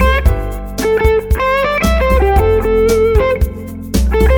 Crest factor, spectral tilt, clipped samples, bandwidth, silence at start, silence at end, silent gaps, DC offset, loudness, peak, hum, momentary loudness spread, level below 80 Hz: 12 dB; -6 dB/octave; under 0.1%; 18.5 kHz; 0 s; 0 s; none; under 0.1%; -13 LUFS; 0 dBFS; none; 8 LU; -16 dBFS